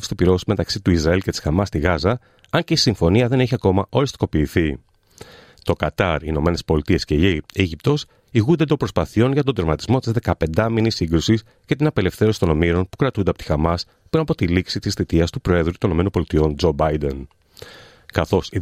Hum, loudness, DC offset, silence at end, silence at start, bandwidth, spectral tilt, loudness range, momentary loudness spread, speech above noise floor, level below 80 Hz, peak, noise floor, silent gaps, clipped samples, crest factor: none; -20 LUFS; under 0.1%; 0 s; 0 s; 15.5 kHz; -6.5 dB/octave; 2 LU; 5 LU; 25 dB; -36 dBFS; -2 dBFS; -44 dBFS; none; under 0.1%; 16 dB